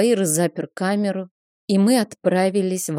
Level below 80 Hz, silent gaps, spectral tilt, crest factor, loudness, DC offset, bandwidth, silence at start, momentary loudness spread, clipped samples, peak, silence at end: -72 dBFS; 1.31-1.68 s; -5 dB/octave; 14 dB; -20 LUFS; under 0.1%; 16 kHz; 0 s; 11 LU; under 0.1%; -6 dBFS; 0 s